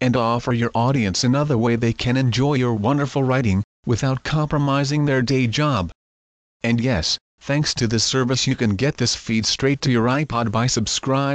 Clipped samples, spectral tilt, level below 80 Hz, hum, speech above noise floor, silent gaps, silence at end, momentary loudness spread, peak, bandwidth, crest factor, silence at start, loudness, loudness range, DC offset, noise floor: under 0.1%; -5 dB/octave; -44 dBFS; none; over 71 dB; 3.64-3.83 s, 5.95-6.60 s, 7.21-7.38 s; 0 s; 3 LU; -8 dBFS; 8.8 kHz; 12 dB; 0 s; -20 LUFS; 2 LU; under 0.1%; under -90 dBFS